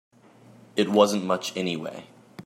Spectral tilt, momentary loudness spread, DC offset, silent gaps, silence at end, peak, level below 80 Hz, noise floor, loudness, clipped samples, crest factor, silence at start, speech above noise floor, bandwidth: -4.5 dB/octave; 15 LU; under 0.1%; none; 0.05 s; -6 dBFS; -76 dBFS; -53 dBFS; -25 LUFS; under 0.1%; 22 dB; 0.75 s; 29 dB; 15.5 kHz